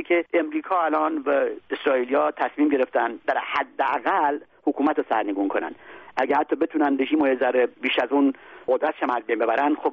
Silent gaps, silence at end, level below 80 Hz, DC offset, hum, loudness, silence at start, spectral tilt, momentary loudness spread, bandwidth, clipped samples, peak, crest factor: none; 0 s; -68 dBFS; under 0.1%; none; -23 LUFS; 0 s; -1 dB/octave; 6 LU; 5.8 kHz; under 0.1%; -8 dBFS; 16 dB